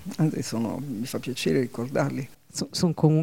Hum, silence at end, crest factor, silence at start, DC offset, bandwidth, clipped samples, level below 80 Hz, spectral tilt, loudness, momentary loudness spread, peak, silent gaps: none; 0 s; 20 dB; 0 s; 0.4%; 17 kHz; under 0.1%; -60 dBFS; -6 dB/octave; -27 LUFS; 9 LU; -6 dBFS; none